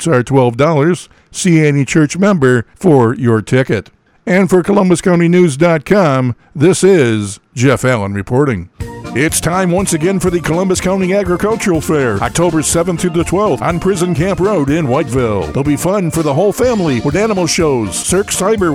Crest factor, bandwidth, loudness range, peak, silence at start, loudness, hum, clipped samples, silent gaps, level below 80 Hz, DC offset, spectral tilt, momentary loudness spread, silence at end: 12 dB; 16 kHz; 3 LU; 0 dBFS; 0 s; -12 LUFS; none; under 0.1%; none; -36 dBFS; under 0.1%; -5.5 dB/octave; 5 LU; 0 s